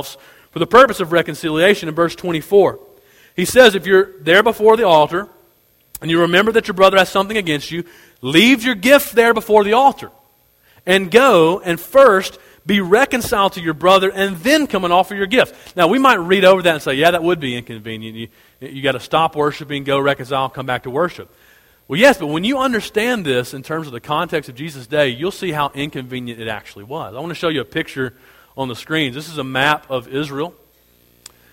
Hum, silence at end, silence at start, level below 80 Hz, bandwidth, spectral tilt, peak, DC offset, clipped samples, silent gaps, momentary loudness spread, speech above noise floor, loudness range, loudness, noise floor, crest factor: none; 1 s; 0 s; -50 dBFS; 17 kHz; -4.5 dB/octave; 0 dBFS; under 0.1%; under 0.1%; none; 16 LU; 40 dB; 8 LU; -15 LUFS; -56 dBFS; 16 dB